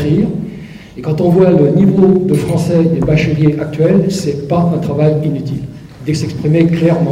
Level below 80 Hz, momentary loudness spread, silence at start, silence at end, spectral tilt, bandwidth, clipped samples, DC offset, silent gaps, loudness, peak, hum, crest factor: -38 dBFS; 14 LU; 0 s; 0 s; -8 dB/octave; 12.5 kHz; under 0.1%; under 0.1%; none; -12 LUFS; 0 dBFS; none; 12 dB